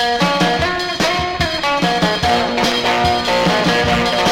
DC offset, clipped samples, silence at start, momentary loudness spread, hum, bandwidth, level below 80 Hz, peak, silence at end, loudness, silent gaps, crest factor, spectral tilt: under 0.1%; under 0.1%; 0 s; 3 LU; none; 16.5 kHz; -34 dBFS; -2 dBFS; 0 s; -15 LUFS; none; 14 dB; -4 dB/octave